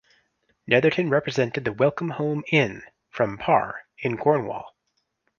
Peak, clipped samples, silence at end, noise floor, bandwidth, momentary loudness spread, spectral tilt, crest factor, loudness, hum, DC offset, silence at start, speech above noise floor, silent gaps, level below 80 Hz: -2 dBFS; under 0.1%; 0.7 s; -75 dBFS; 7.2 kHz; 13 LU; -6.5 dB/octave; 22 dB; -23 LUFS; none; under 0.1%; 0.65 s; 52 dB; none; -60 dBFS